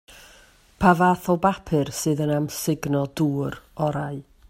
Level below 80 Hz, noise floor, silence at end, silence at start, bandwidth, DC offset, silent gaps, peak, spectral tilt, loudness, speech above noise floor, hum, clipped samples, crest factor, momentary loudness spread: -50 dBFS; -53 dBFS; 0.3 s; 0.1 s; 16 kHz; under 0.1%; none; -4 dBFS; -6 dB/octave; -23 LUFS; 31 dB; none; under 0.1%; 20 dB; 9 LU